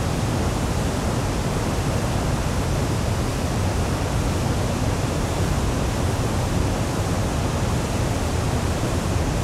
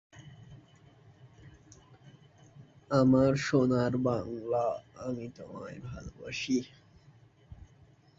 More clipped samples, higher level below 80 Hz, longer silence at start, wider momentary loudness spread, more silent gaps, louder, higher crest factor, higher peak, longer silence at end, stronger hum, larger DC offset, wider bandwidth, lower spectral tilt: neither; first, -30 dBFS vs -58 dBFS; second, 0 s vs 0.15 s; second, 1 LU vs 20 LU; neither; first, -23 LUFS vs -30 LUFS; second, 12 dB vs 22 dB; about the same, -10 dBFS vs -12 dBFS; second, 0 s vs 0.55 s; neither; neither; first, 15.5 kHz vs 7.8 kHz; about the same, -5.5 dB/octave vs -6.5 dB/octave